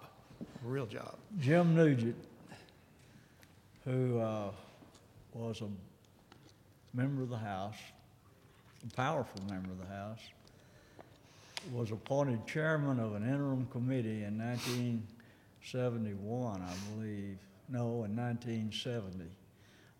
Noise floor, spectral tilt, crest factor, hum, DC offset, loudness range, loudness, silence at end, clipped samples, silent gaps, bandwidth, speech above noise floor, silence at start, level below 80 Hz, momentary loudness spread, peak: -63 dBFS; -7 dB/octave; 22 dB; none; under 0.1%; 8 LU; -37 LUFS; 0.55 s; under 0.1%; none; 16.5 kHz; 27 dB; 0 s; -72 dBFS; 18 LU; -16 dBFS